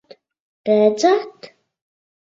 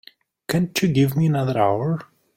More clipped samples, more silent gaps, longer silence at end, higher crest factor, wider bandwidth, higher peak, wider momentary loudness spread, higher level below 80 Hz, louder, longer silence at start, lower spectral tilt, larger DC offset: neither; neither; first, 0.8 s vs 0.35 s; about the same, 18 dB vs 16 dB; second, 7.8 kHz vs 16.5 kHz; first, -2 dBFS vs -6 dBFS; first, 15 LU vs 8 LU; second, -70 dBFS vs -54 dBFS; first, -17 LUFS vs -21 LUFS; first, 0.65 s vs 0.5 s; second, -5 dB/octave vs -6.5 dB/octave; neither